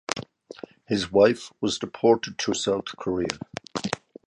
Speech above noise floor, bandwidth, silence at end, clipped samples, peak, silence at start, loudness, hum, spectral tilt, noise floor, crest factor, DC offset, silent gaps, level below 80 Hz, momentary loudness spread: 20 dB; 11 kHz; 0.3 s; under 0.1%; 0 dBFS; 0.1 s; -25 LUFS; none; -4 dB/octave; -44 dBFS; 26 dB; under 0.1%; none; -58 dBFS; 16 LU